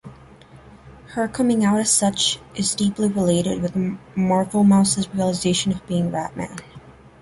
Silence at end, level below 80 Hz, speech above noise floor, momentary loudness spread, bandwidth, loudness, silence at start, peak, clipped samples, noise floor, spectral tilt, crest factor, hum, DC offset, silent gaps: 0.3 s; -50 dBFS; 26 dB; 10 LU; 11.5 kHz; -20 LUFS; 0.05 s; -4 dBFS; under 0.1%; -46 dBFS; -4.5 dB/octave; 16 dB; none; under 0.1%; none